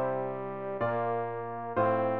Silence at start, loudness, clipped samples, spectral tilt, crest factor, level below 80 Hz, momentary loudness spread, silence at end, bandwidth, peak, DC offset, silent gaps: 0 s; -32 LUFS; under 0.1%; -6.5 dB/octave; 16 dB; -68 dBFS; 8 LU; 0 s; 4.5 kHz; -16 dBFS; 0.3%; none